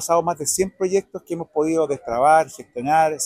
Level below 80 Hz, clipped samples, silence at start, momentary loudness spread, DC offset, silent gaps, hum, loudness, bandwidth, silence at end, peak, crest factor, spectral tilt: -56 dBFS; under 0.1%; 0 s; 13 LU; under 0.1%; none; none; -20 LUFS; 16 kHz; 0 s; -4 dBFS; 16 dB; -4 dB/octave